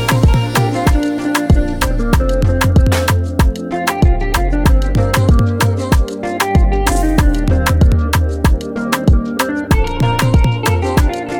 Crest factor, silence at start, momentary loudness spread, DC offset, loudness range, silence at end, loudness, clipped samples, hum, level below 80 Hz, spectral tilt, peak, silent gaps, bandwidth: 12 dB; 0 s; 4 LU; under 0.1%; 1 LU; 0 s; -14 LUFS; under 0.1%; none; -16 dBFS; -6 dB/octave; 0 dBFS; none; 18.5 kHz